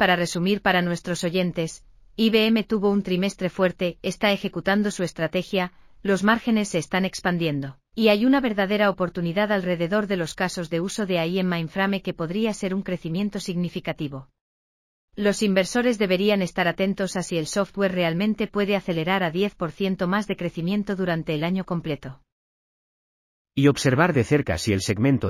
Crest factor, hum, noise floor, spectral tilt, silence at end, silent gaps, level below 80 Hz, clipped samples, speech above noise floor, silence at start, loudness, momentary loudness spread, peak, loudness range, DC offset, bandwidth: 18 dB; none; under -90 dBFS; -5.5 dB/octave; 0 s; 14.41-15.08 s, 22.32-23.45 s; -52 dBFS; under 0.1%; over 67 dB; 0 s; -24 LUFS; 8 LU; -4 dBFS; 4 LU; under 0.1%; 15 kHz